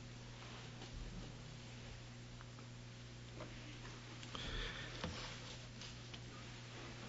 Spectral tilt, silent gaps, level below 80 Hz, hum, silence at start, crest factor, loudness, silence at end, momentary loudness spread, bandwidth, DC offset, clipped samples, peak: -3.5 dB/octave; none; -58 dBFS; 60 Hz at -55 dBFS; 0 s; 22 dB; -51 LUFS; 0 s; 8 LU; 7.6 kHz; under 0.1%; under 0.1%; -30 dBFS